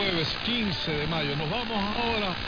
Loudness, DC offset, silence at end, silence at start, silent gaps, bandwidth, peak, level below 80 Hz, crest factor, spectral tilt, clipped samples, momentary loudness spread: -27 LUFS; under 0.1%; 0 s; 0 s; none; 5.4 kHz; -14 dBFS; -44 dBFS; 14 dB; -5.5 dB/octave; under 0.1%; 2 LU